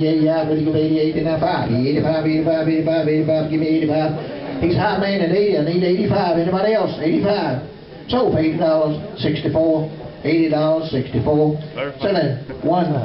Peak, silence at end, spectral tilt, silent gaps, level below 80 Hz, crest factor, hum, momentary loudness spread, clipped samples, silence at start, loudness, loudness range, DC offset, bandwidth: -8 dBFS; 0 s; -10.5 dB/octave; none; -46 dBFS; 10 dB; none; 6 LU; under 0.1%; 0 s; -18 LUFS; 1 LU; under 0.1%; 5.8 kHz